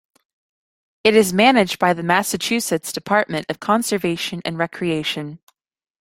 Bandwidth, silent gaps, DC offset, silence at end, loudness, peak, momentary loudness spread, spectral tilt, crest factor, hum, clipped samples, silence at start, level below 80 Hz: 16.5 kHz; none; under 0.1%; 0.65 s; -19 LUFS; -2 dBFS; 10 LU; -4 dB/octave; 20 dB; none; under 0.1%; 1.05 s; -58 dBFS